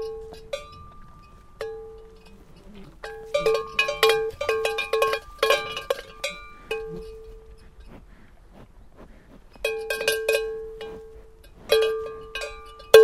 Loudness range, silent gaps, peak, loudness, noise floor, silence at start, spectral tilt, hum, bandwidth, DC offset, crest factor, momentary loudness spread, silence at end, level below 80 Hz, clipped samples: 14 LU; none; 0 dBFS; -25 LUFS; -49 dBFS; 0 s; -1.5 dB/octave; none; 16 kHz; under 0.1%; 26 dB; 23 LU; 0 s; -48 dBFS; under 0.1%